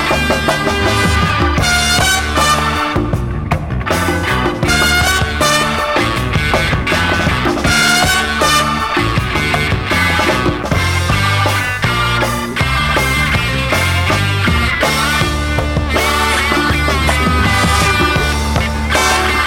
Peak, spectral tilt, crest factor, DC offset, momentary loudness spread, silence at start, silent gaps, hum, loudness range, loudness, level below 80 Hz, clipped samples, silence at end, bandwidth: -2 dBFS; -4 dB/octave; 10 dB; under 0.1%; 4 LU; 0 s; none; none; 1 LU; -13 LUFS; -24 dBFS; under 0.1%; 0 s; 18 kHz